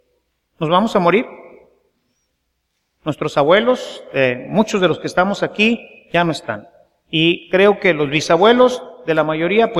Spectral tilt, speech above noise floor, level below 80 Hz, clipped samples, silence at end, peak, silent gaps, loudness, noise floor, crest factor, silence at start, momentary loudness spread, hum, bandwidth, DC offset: -5.5 dB/octave; 55 dB; -54 dBFS; under 0.1%; 0 s; 0 dBFS; none; -16 LUFS; -70 dBFS; 16 dB; 0.6 s; 12 LU; none; 12.5 kHz; under 0.1%